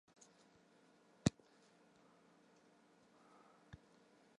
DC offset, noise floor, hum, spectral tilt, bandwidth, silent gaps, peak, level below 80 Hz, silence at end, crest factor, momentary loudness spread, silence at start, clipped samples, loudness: under 0.1%; -71 dBFS; none; -5.5 dB/octave; 11 kHz; none; -18 dBFS; -68 dBFS; 3.1 s; 32 dB; 29 LU; 1.25 s; under 0.1%; -41 LUFS